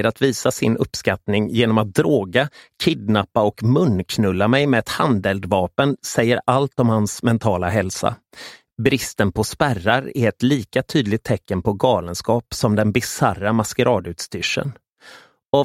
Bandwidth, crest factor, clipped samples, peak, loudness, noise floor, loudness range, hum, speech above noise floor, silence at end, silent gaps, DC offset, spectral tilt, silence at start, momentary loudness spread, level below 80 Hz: 16 kHz; 18 dB; under 0.1%; 0 dBFS; -19 LUFS; -46 dBFS; 2 LU; none; 27 dB; 0 s; 14.89-14.96 s, 15.45-15.49 s; under 0.1%; -5.5 dB/octave; 0 s; 5 LU; -48 dBFS